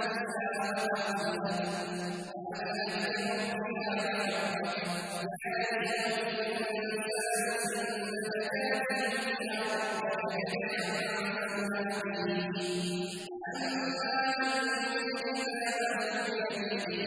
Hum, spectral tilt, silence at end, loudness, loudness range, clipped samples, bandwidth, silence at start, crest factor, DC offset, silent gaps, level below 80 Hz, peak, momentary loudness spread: none; -3.5 dB/octave; 0 s; -33 LUFS; 2 LU; under 0.1%; 11 kHz; 0 s; 14 dB; under 0.1%; none; -76 dBFS; -18 dBFS; 4 LU